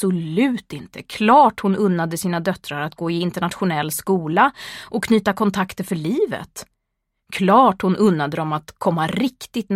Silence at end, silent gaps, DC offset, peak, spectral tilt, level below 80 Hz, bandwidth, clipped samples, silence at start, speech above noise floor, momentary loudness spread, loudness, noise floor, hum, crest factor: 0 s; none; under 0.1%; -2 dBFS; -6 dB/octave; -56 dBFS; 16 kHz; under 0.1%; 0 s; 57 dB; 14 LU; -19 LUFS; -76 dBFS; none; 18 dB